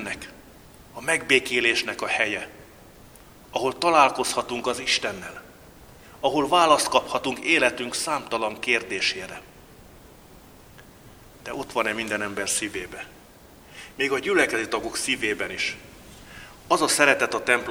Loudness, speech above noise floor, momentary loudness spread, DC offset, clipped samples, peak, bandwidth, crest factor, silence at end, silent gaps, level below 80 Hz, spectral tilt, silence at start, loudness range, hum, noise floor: -23 LUFS; 26 dB; 21 LU; under 0.1%; under 0.1%; 0 dBFS; over 20 kHz; 26 dB; 0 s; none; -56 dBFS; -2 dB/octave; 0 s; 7 LU; none; -49 dBFS